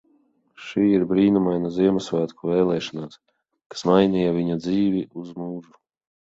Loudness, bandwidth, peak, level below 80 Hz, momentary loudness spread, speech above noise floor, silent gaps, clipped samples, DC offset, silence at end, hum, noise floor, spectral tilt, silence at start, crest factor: -22 LUFS; 7.8 kHz; -4 dBFS; -56 dBFS; 16 LU; 41 dB; 3.66-3.70 s; under 0.1%; under 0.1%; 0.65 s; none; -63 dBFS; -7.5 dB/octave; 0.6 s; 20 dB